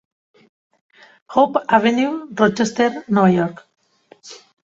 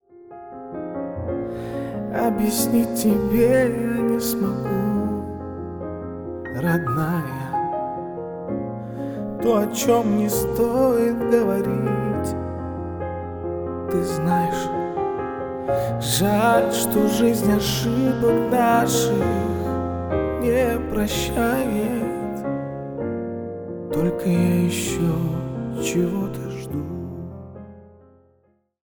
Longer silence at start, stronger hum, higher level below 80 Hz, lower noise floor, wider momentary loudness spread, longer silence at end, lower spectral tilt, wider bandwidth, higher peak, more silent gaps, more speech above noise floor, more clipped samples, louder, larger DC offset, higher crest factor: first, 1.3 s vs 0.15 s; neither; second, -58 dBFS vs -42 dBFS; second, -48 dBFS vs -63 dBFS; about the same, 15 LU vs 13 LU; second, 0.3 s vs 0.95 s; about the same, -6 dB/octave vs -5.5 dB/octave; second, 7.8 kHz vs over 20 kHz; about the same, -2 dBFS vs -4 dBFS; neither; second, 32 dB vs 44 dB; neither; first, -17 LUFS vs -22 LUFS; neither; about the same, 18 dB vs 18 dB